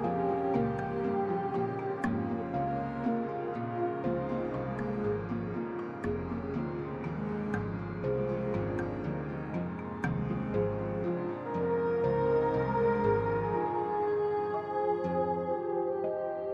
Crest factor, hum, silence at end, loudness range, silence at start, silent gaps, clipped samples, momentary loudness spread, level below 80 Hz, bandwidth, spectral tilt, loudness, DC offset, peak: 16 dB; none; 0 s; 5 LU; 0 s; none; under 0.1%; 7 LU; -54 dBFS; 8 kHz; -9.5 dB/octave; -33 LUFS; under 0.1%; -16 dBFS